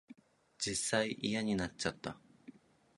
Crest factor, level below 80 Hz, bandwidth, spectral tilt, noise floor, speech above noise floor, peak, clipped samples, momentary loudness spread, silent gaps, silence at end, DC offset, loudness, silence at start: 22 dB; -64 dBFS; 11.5 kHz; -3.5 dB/octave; -59 dBFS; 22 dB; -16 dBFS; under 0.1%; 13 LU; none; 0.45 s; under 0.1%; -36 LUFS; 0.1 s